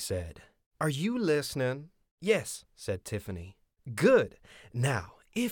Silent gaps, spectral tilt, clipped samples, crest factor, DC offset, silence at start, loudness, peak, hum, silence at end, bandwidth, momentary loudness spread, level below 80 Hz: 0.66-0.71 s, 2.11-2.18 s; -5.5 dB/octave; under 0.1%; 20 dB; under 0.1%; 0 s; -31 LUFS; -10 dBFS; none; 0 s; 19 kHz; 17 LU; -58 dBFS